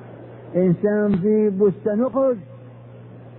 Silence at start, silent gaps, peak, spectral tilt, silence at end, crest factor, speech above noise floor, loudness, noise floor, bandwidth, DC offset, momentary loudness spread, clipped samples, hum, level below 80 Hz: 0 s; none; -8 dBFS; -13.5 dB/octave; 0 s; 14 dB; 22 dB; -20 LUFS; -41 dBFS; 3.9 kHz; under 0.1%; 17 LU; under 0.1%; none; -56 dBFS